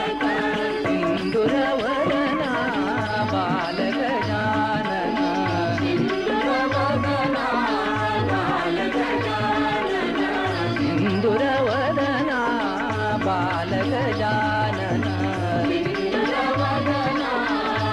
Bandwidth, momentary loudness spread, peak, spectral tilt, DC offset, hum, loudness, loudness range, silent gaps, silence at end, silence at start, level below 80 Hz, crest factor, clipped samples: 11 kHz; 2 LU; -10 dBFS; -6.5 dB/octave; under 0.1%; none; -22 LUFS; 1 LU; none; 0 s; 0 s; -48 dBFS; 12 dB; under 0.1%